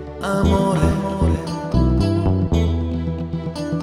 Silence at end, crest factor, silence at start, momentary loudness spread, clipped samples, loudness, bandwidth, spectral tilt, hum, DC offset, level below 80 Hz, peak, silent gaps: 0 s; 14 dB; 0 s; 8 LU; under 0.1%; -20 LUFS; 13.5 kHz; -7.5 dB/octave; none; under 0.1%; -26 dBFS; -4 dBFS; none